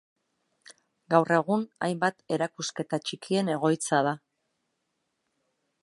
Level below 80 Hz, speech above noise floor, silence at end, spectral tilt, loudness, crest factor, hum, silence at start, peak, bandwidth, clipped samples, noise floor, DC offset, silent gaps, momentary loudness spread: -78 dBFS; 52 dB; 1.65 s; -5 dB/octave; -27 LUFS; 24 dB; none; 1.1 s; -6 dBFS; 11.5 kHz; under 0.1%; -79 dBFS; under 0.1%; none; 8 LU